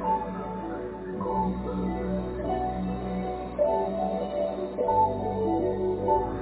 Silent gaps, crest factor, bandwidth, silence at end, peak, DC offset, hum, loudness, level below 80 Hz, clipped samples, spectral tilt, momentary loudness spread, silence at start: none; 16 dB; 4 kHz; 0 s; -12 dBFS; under 0.1%; none; -29 LUFS; -44 dBFS; under 0.1%; -7.5 dB/octave; 8 LU; 0 s